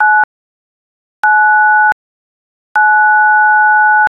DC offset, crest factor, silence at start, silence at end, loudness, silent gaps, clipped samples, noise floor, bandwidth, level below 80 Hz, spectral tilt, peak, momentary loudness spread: under 0.1%; 10 dB; 0 s; 0.05 s; -9 LUFS; 0.24-1.23 s, 1.92-2.75 s; under 0.1%; under -90 dBFS; 5.4 kHz; -62 dBFS; -2 dB/octave; -2 dBFS; 8 LU